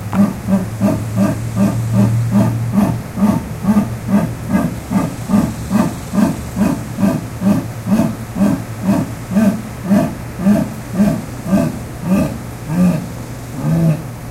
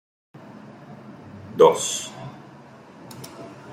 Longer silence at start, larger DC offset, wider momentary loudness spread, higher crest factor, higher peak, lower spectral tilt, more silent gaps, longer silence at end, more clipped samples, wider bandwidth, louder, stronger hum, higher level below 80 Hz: second, 0 s vs 0.7 s; neither; second, 6 LU vs 27 LU; second, 14 dB vs 24 dB; about the same, 0 dBFS vs -2 dBFS; first, -7.5 dB/octave vs -3.5 dB/octave; neither; about the same, 0 s vs 0 s; neither; about the same, 16 kHz vs 15.5 kHz; first, -17 LUFS vs -20 LUFS; neither; first, -36 dBFS vs -70 dBFS